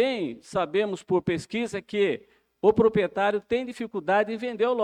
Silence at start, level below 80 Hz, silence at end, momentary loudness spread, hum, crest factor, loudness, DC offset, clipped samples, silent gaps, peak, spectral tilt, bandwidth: 0 s; -58 dBFS; 0 s; 8 LU; none; 18 dB; -26 LUFS; under 0.1%; under 0.1%; none; -8 dBFS; -6 dB/octave; 10.5 kHz